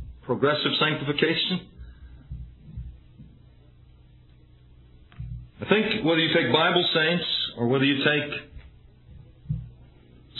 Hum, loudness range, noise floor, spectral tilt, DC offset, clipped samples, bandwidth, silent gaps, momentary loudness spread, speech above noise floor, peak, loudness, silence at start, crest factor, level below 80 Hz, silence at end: none; 12 LU; -53 dBFS; -8 dB/octave; under 0.1%; under 0.1%; 4.3 kHz; none; 22 LU; 30 dB; -6 dBFS; -23 LUFS; 0 s; 22 dB; -48 dBFS; 0 s